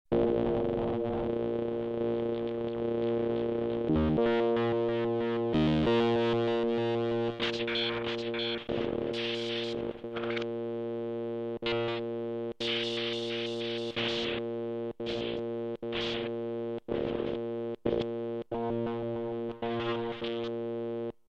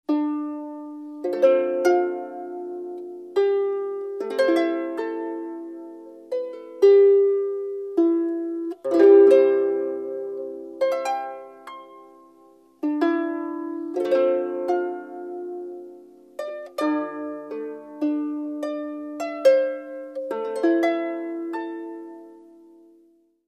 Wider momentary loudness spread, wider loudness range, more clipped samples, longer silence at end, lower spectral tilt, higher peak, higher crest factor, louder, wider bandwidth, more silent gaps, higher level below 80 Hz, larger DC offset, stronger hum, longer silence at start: second, 8 LU vs 18 LU; second, 6 LU vs 10 LU; neither; second, 0.2 s vs 1.1 s; first, -6.5 dB/octave vs -4.5 dB/octave; second, -16 dBFS vs -4 dBFS; about the same, 16 dB vs 18 dB; second, -32 LUFS vs -23 LUFS; second, 8.2 kHz vs 9.8 kHz; neither; first, -54 dBFS vs -82 dBFS; neither; neither; about the same, 0.1 s vs 0.1 s